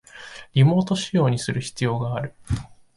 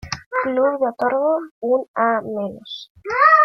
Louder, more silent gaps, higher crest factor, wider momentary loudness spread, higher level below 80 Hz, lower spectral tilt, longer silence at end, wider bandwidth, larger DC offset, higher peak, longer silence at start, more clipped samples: second, -23 LUFS vs -20 LUFS; second, none vs 0.26-0.31 s, 1.51-1.61 s, 1.88-1.94 s, 2.90-2.95 s; about the same, 16 dB vs 18 dB; about the same, 12 LU vs 12 LU; first, -44 dBFS vs -56 dBFS; first, -6.5 dB/octave vs -4.5 dB/octave; first, 0.3 s vs 0 s; first, 11.5 kHz vs 6.8 kHz; neither; second, -8 dBFS vs -2 dBFS; about the same, 0.15 s vs 0.05 s; neither